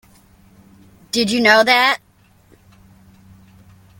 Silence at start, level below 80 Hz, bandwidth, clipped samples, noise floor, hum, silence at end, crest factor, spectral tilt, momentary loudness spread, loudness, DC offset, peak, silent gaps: 1.15 s; -56 dBFS; 17 kHz; under 0.1%; -52 dBFS; none; 2.05 s; 20 dB; -3 dB/octave; 12 LU; -14 LUFS; under 0.1%; 0 dBFS; none